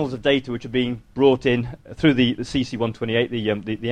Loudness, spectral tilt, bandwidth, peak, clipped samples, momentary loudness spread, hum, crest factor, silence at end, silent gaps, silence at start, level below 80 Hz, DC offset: -21 LUFS; -6.5 dB/octave; 9.4 kHz; -4 dBFS; under 0.1%; 8 LU; none; 18 dB; 0 s; none; 0 s; -46 dBFS; under 0.1%